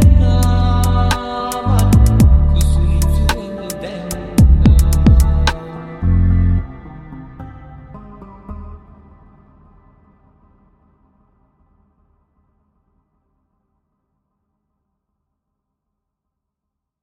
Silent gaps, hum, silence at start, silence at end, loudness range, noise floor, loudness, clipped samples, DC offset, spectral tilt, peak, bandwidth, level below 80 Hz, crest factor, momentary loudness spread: none; none; 0 s; 8.25 s; 22 LU; -80 dBFS; -14 LUFS; under 0.1%; under 0.1%; -6.5 dB/octave; 0 dBFS; 16 kHz; -18 dBFS; 16 dB; 24 LU